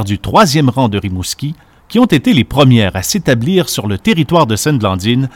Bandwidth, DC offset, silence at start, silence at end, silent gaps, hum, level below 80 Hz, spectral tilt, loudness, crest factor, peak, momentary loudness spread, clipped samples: 17.5 kHz; under 0.1%; 0 s; 0.05 s; none; none; -38 dBFS; -5.5 dB/octave; -12 LUFS; 12 dB; 0 dBFS; 10 LU; 0.3%